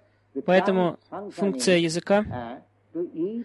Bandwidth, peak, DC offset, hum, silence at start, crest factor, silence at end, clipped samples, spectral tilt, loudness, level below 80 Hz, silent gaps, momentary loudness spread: 12 kHz; -6 dBFS; under 0.1%; none; 0.35 s; 18 dB; 0 s; under 0.1%; -5 dB/octave; -24 LUFS; -56 dBFS; none; 17 LU